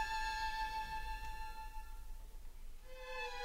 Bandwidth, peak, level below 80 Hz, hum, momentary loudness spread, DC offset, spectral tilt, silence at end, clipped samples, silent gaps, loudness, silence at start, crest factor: 16 kHz; -28 dBFS; -48 dBFS; none; 19 LU; under 0.1%; -2 dB/octave; 0 s; under 0.1%; none; -44 LUFS; 0 s; 16 dB